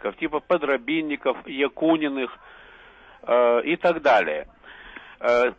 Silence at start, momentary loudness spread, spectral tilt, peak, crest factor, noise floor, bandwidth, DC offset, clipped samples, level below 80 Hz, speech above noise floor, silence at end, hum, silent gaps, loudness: 0 s; 17 LU; -6 dB/octave; -8 dBFS; 14 dB; -49 dBFS; 7.8 kHz; under 0.1%; under 0.1%; -58 dBFS; 27 dB; 0.05 s; none; none; -23 LUFS